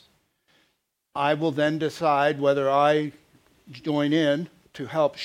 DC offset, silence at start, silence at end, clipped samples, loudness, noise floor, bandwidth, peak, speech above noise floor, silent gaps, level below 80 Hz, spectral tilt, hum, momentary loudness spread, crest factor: under 0.1%; 1.15 s; 0 s; under 0.1%; -24 LUFS; -74 dBFS; 13 kHz; -6 dBFS; 51 dB; none; -70 dBFS; -6 dB/octave; none; 14 LU; 18 dB